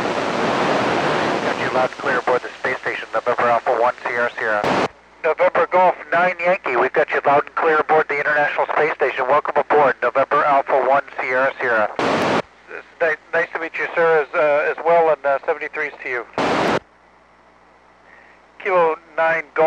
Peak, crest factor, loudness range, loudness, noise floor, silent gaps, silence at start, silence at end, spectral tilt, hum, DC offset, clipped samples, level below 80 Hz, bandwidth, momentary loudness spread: -6 dBFS; 14 dB; 4 LU; -18 LUFS; -51 dBFS; none; 0 s; 0 s; -5 dB/octave; 60 Hz at -60 dBFS; under 0.1%; under 0.1%; -60 dBFS; 10.5 kHz; 7 LU